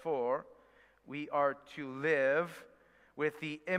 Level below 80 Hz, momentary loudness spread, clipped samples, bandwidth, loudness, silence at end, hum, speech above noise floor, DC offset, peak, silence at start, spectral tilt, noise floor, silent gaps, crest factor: -78 dBFS; 14 LU; under 0.1%; 14.5 kHz; -35 LUFS; 0 s; none; 30 dB; under 0.1%; -18 dBFS; 0 s; -6 dB/octave; -65 dBFS; none; 18 dB